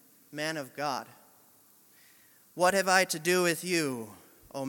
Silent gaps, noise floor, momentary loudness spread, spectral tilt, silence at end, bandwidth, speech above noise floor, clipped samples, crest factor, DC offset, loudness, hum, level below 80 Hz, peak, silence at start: none; -61 dBFS; 20 LU; -3 dB/octave; 0 s; 17.5 kHz; 32 dB; under 0.1%; 22 dB; under 0.1%; -28 LUFS; none; -74 dBFS; -8 dBFS; 0.3 s